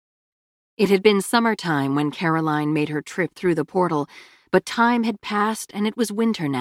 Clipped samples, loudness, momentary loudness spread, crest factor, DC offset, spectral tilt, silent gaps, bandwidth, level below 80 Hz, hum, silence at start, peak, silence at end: under 0.1%; -21 LUFS; 8 LU; 18 dB; under 0.1%; -5.5 dB/octave; none; 16 kHz; -64 dBFS; none; 0.8 s; -4 dBFS; 0 s